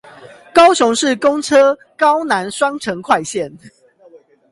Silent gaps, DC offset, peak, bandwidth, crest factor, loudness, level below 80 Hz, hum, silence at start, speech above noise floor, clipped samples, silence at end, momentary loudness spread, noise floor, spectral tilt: none; under 0.1%; 0 dBFS; 11.5 kHz; 16 dB; -14 LUFS; -56 dBFS; none; 0.2 s; 32 dB; under 0.1%; 0.85 s; 12 LU; -46 dBFS; -3 dB/octave